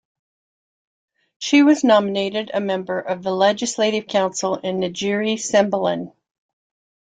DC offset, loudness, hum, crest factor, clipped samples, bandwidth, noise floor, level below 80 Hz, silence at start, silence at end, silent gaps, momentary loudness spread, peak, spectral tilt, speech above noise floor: under 0.1%; -19 LUFS; none; 18 dB; under 0.1%; 9.4 kHz; under -90 dBFS; -66 dBFS; 1.4 s; 1 s; none; 9 LU; -2 dBFS; -4 dB/octave; over 71 dB